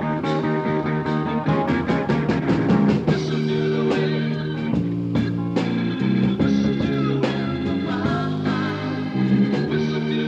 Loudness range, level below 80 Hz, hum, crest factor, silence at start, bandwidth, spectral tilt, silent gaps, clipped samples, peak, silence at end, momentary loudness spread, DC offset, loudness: 1 LU; -46 dBFS; none; 14 dB; 0 s; 8 kHz; -8 dB/octave; none; under 0.1%; -6 dBFS; 0 s; 5 LU; under 0.1%; -22 LUFS